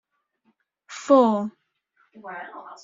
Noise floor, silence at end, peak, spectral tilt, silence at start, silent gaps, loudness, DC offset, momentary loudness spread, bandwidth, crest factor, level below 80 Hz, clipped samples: -70 dBFS; 0.1 s; -4 dBFS; -5 dB/octave; 0.9 s; none; -20 LUFS; under 0.1%; 23 LU; 7.8 kHz; 20 dB; -76 dBFS; under 0.1%